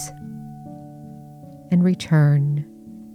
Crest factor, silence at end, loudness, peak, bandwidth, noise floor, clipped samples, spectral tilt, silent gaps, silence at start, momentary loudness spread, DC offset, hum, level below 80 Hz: 14 dB; 0.05 s; -19 LUFS; -8 dBFS; 10.5 kHz; -41 dBFS; under 0.1%; -7.5 dB/octave; none; 0 s; 24 LU; under 0.1%; none; -58 dBFS